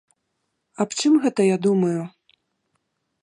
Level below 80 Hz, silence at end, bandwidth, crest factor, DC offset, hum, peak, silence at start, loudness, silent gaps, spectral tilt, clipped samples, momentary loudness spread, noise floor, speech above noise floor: -76 dBFS; 1.15 s; 11 kHz; 16 dB; under 0.1%; none; -6 dBFS; 0.8 s; -21 LUFS; none; -5.5 dB/octave; under 0.1%; 10 LU; -75 dBFS; 56 dB